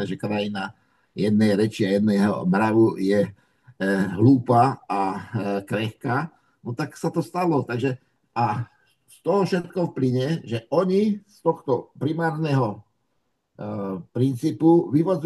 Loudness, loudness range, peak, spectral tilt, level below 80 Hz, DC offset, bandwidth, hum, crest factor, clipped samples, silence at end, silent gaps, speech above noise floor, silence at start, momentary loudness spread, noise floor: -23 LUFS; 6 LU; -4 dBFS; -7.5 dB/octave; -66 dBFS; under 0.1%; 12.5 kHz; none; 18 dB; under 0.1%; 0 s; none; 52 dB; 0 s; 13 LU; -74 dBFS